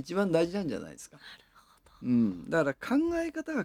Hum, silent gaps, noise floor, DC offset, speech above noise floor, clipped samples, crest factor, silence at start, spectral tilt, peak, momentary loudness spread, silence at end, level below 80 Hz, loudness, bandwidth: none; none; -61 dBFS; under 0.1%; 31 dB; under 0.1%; 18 dB; 0 s; -6.5 dB/octave; -14 dBFS; 19 LU; 0 s; -62 dBFS; -30 LUFS; 15 kHz